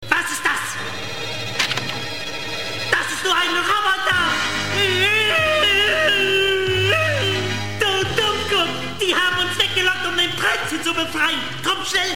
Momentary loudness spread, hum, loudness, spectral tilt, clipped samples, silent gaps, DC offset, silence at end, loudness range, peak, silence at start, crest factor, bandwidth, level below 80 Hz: 10 LU; none; -18 LUFS; -2.5 dB/octave; under 0.1%; none; 1%; 0 s; 4 LU; -2 dBFS; 0 s; 18 dB; 17 kHz; -48 dBFS